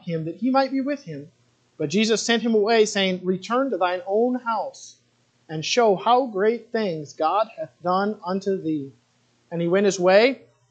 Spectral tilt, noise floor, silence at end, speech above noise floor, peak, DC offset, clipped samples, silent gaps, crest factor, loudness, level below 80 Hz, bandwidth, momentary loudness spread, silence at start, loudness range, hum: -4.5 dB/octave; -64 dBFS; 0.35 s; 42 dB; -2 dBFS; under 0.1%; under 0.1%; none; 20 dB; -22 LUFS; -78 dBFS; 9 kHz; 13 LU; 0.05 s; 3 LU; none